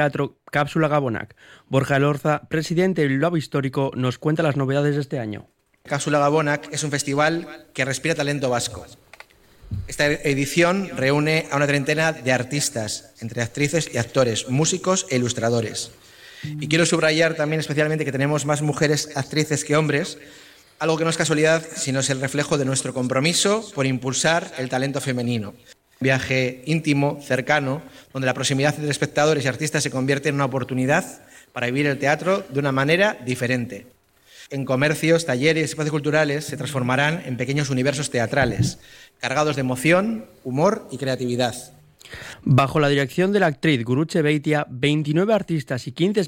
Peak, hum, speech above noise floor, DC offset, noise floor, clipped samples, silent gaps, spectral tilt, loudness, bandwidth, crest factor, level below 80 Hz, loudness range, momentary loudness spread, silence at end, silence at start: -4 dBFS; none; 27 dB; under 0.1%; -49 dBFS; under 0.1%; none; -4.5 dB/octave; -21 LUFS; 17 kHz; 18 dB; -54 dBFS; 2 LU; 9 LU; 0 s; 0 s